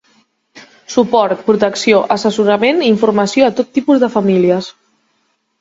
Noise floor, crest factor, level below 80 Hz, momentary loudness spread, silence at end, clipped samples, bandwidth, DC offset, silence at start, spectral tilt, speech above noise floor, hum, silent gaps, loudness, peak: -63 dBFS; 14 dB; -58 dBFS; 4 LU; 0.9 s; under 0.1%; 8 kHz; under 0.1%; 0.55 s; -5.5 dB/octave; 51 dB; none; none; -13 LUFS; 0 dBFS